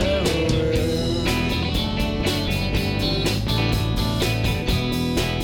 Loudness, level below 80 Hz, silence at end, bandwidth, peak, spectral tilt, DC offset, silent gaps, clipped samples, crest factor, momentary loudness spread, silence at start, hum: -22 LUFS; -30 dBFS; 0 s; 19 kHz; -10 dBFS; -5.5 dB/octave; under 0.1%; none; under 0.1%; 12 dB; 2 LU; 0 s; none